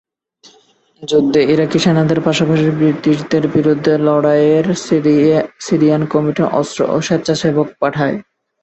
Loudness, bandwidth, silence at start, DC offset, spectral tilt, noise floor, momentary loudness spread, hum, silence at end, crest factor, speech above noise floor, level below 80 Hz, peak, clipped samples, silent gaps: -14 LUFS; 8.4 kHz; 1 s; under 0.1%; -6.5 dB/octave; -51 dBFS; 5 LU; none; 0.4 s; 14 dB; 38 dB; -52 dBFS; 0 dBFS; under 0.1%; none